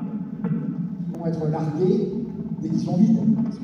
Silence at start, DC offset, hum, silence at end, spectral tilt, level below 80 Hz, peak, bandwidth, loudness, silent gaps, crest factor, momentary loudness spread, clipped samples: 0 s; under 0.1%; none; 0 s; -10 dB/octave; -58 dBFS; -6 dBFS; 6.8 kHz; -24 LUFS; none; 16 dB; 11 LU; under 0.1%